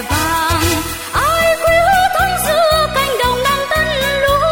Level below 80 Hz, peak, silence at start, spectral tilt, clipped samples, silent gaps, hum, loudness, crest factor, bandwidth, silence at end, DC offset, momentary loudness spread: -30 dBFS; 0 dBFS; 0 s; -3 dB/octave; under 0.1%; none; none; -13 LUFS; 14 dB; 17 kHz; 0 s; under 0.1%; 4 LU